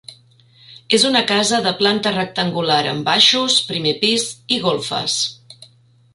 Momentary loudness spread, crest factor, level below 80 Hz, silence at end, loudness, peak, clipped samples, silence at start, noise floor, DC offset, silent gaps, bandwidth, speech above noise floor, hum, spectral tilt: 8 LU; 18 dB; -60 dBFS; 0.5 s; -16 LUFS; 0 dBFS; under 0.1%; 0.1 s; -52 dBFS; under 0.1%; none; 11.5 kHz; 34 dB; none; -2.5 dB/octave